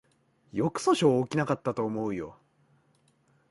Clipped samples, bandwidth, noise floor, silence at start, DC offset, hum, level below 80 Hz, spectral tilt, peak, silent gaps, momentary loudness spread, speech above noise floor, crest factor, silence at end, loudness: under 0.1%; 11.5 kHz; -67 dBFS; 0.55 s; under 0.1%; none; -66 dBFS; -6 dB/octave; -10 dBFS; none; 14 LU; 40 dB; 20 dB; 1.2 s; -28 LUFS